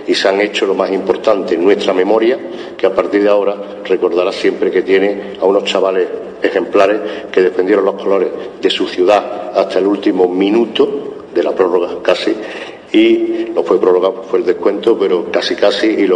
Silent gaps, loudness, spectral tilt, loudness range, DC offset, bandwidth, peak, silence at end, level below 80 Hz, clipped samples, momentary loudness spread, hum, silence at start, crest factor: none; -14 LUFS; -5 dB/octave; 1 LU; under 0.1%; 9.8 kHz; 0 dBFS; 0 s; -56 dBFS; under 0.1%; 6 LU; none; 0 s; 14 dB